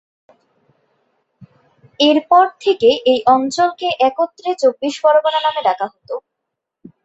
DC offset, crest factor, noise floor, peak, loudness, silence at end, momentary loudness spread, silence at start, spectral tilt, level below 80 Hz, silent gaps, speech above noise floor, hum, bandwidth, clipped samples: under 0.1%; 16 dB; -79 dBFS; -2 dBFS; -15 LUFS; 0.85 s; 10 LU; 1.4 s; -3.5 dB/octave; -66 dBFS; none; 64 dB; none; 8.2 kHz; under 0.1%